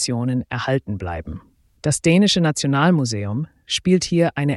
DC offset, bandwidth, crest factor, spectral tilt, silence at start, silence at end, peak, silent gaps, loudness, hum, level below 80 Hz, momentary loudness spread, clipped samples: under 0.1%; 12 kHz; 16 dB; -5 dB/octave; 0 s; 0 s; -4 dBFS; none; -20 LUFS; none; -46 dBFS; 13 LU; under 0.1%